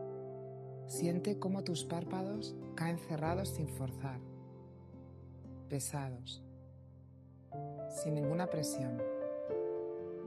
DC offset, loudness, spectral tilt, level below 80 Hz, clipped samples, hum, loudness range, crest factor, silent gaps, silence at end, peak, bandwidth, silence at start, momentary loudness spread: under 0.1%; -40 LUFS; -5.5 dB/octave; -72 dBFS; under 0.1%; none; 7 LU; 18 dB; none; 0 s; -22 dBFS; 13 kHz; 0 s; 18 LU